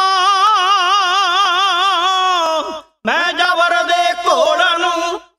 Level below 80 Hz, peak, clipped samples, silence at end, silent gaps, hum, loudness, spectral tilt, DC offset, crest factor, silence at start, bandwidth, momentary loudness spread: -60 dBFS; -2 dBFS; under 0.1%; 0.2 s; none; none; -13 LUFS; 0 dB/octave; under 0.1%; 14 dB; 0 s; 14 kHz; 6 LU